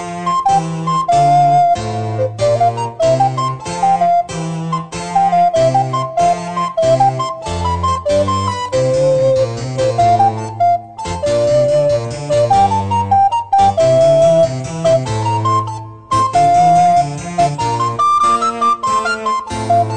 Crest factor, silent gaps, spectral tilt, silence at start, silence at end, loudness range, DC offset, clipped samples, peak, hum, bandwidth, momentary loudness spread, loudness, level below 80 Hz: 12 dB; none; -5.5 dB/octave; 0 s; 0 s; 3 LU; 0.4%; under 0.1%; -2 dBFS; none; 9.4 kHz; 9 LU; -14 LUFS; -42 dBFS